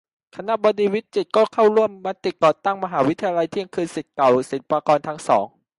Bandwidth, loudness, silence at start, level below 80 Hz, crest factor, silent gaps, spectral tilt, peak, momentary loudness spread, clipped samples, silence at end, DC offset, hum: 11.5 kHz; -20 LUFS; 0.35 s; -66 dBFS; 16 dB; none; -5.5 dB/octave; -4 dBFS; 10 LU; under 0.1%; 0.3 s; under 0.1%; none